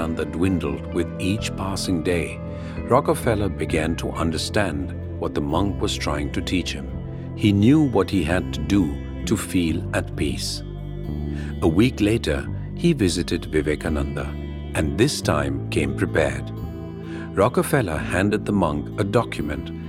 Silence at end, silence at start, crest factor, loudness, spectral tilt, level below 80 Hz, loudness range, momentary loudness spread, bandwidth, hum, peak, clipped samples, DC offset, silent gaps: 0 s; 0 s; 20 dB; -23 LUFS; -6 dB/octave; -36 dBFS; 3 LU; 11 LU; 16 kHz; none; -2 dBFS; under 0.1%; under 0.1%; none